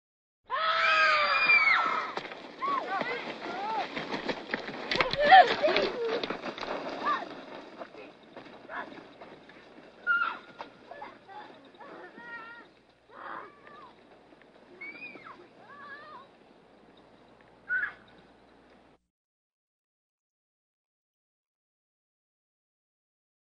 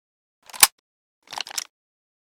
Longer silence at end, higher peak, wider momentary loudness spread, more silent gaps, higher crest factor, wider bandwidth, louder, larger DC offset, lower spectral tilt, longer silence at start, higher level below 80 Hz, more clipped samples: first, 5.6 s vs 0.65 s; second, -6 dBFS vs 0 dBFS; first, 27 LU vs 21 LU; second, none vs 0.72-1.22 s; about the same, 26 dB vs 28 dB; second, 8 kHz vs 18 kHz; second, -27 LUFS vs -20 LUFS; neither; first, -3.5 dB/octave vs 3 dB/octave; about the same, 0.5 s vs 0.55 s; first, -64 dBFS vs -70 dBFS; neither